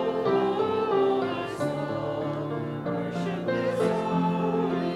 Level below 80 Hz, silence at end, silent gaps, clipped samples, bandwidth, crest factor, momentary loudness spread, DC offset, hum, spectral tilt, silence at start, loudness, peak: -60 dBFS; 0 s; none; under 0.1%; 12 kHz; 14 dB; 6 LU; under 0.1%; none; -7.5 dB/octave; 0 s; -27 LUFS; -12 dBFS